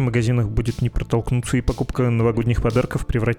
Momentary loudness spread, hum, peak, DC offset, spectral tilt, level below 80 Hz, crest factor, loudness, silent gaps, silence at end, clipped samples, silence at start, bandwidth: 4 LU; none; -6 dBFS; under 0.1%; -7.5 dB/octave; -30 dBFS; 14 dB; -21 LUFS; none; 0 s; under 0.1%; 0 s; 13 kHz